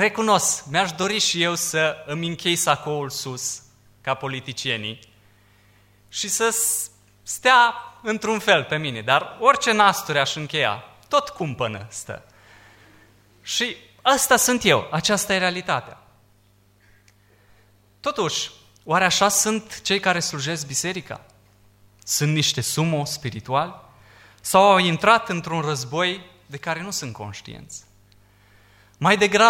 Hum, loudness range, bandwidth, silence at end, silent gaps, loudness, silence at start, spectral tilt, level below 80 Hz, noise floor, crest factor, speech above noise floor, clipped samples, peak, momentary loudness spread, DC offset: 50 Hz at -55 dBFS; 8 LU; 16.5 kHz; 0 s; none; -21 LUFS; 0 s; -2.5 dB/octave; -60 dBFS; -58 dBFS; 22 dB; 37 dB; under 0.1%; -2 dBFS; 16 LU; under 0.1%